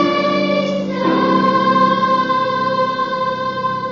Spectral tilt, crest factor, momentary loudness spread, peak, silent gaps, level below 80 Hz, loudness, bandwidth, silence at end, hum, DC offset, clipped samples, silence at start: -6.5 dB/octave; 14 dB; 6 LU; -2 dBFS; none; -56 dBFS; -16 LUFS; 7.2 kHz; 0 s; none; under 0.1%; under 0.1%; 0 s